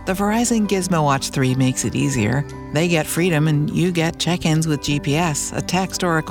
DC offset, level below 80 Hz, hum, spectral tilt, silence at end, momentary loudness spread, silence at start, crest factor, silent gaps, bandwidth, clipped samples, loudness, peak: under 0.1%; -42 dBFS; none; -5 dB/octave; 0 s; 3 LU; 0 s; 14 dB; none; 18 kHz; under 0.1%; -19 LUFS; -4 dBFS